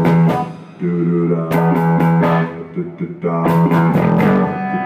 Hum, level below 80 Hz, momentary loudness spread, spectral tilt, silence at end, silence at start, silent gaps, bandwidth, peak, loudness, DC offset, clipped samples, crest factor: none; -52 dBFS; 11 LU; -9 dB/octave; 0 s; 0 s; none; 15 kHz; -4 dBFS; -15 LUFS; under 0.1%; under 0.1%; 10 dB